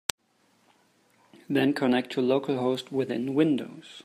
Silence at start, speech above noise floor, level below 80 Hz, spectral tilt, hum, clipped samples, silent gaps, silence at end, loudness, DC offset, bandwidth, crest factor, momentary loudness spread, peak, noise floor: 1.5 s; 41 dB; -70 dBFS; -5 dB/octave; none; under 0.1%; none; 0.05 s; -27 LUFS; under 0.1%; 15 kHz; 26 dB; 6 LU; -2 dBFS; -67 dBFS